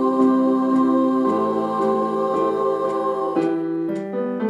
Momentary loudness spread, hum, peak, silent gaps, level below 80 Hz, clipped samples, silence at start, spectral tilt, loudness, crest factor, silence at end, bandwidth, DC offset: 7 LU; none; -6 dBFS; none; -74 dBFS; under 0.1%; 0 s; -8 dB/octave; -20 LUFS; 14 dB; 0 s; 9.6 kHz; under 0.1%